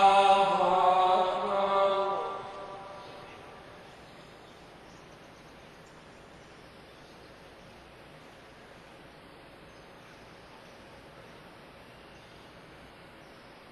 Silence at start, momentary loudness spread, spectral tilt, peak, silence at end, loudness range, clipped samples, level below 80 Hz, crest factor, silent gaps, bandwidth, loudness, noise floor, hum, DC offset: 0 s; 27 LU; -4 dB/octave; -10 dBFS; 0.85 s; 23 LU; under 0.1%; -64 dBFS; 22 dB; none; 12 kHz; -26 LUFS; -52 dBFS; none; under 0.1%